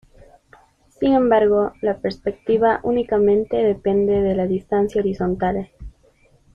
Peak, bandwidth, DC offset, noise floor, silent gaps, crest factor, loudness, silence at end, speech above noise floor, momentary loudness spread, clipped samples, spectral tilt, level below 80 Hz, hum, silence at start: -4 dBFS; 7 kHz; under 0.1%; -56 dBFS; none; 16 dB; -19 LUFS; 0.65 s; 37 dB; 8 LU; under 0.1%; -8.5 dB/octave; -44 dBFS; none; 1 s